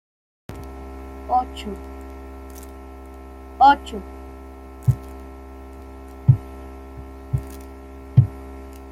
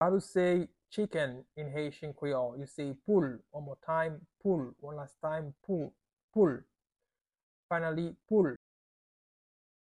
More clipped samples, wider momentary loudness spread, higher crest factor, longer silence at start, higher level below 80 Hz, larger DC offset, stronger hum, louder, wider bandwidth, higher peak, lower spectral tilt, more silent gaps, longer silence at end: neither; first, 21 LU vs 14 LU; about the same, 22 dB vs 20 dB; first, 0.5 s vs 0 s; first, -38 dBFS vs -70 dBFS; neither; neither; first, -21 LUFS vs -34 LUFS; first, 15 kHz vs 11.5 kHz; first, -2 dBFS vs -14 dBFS; about the same, -7.5 dB/octave vs -7.5 dB/octave; second, none vs 6.13-6.17 s, 6.23-6.28 s, 7.43-7.69 s; second, 0 s vs 1.3 s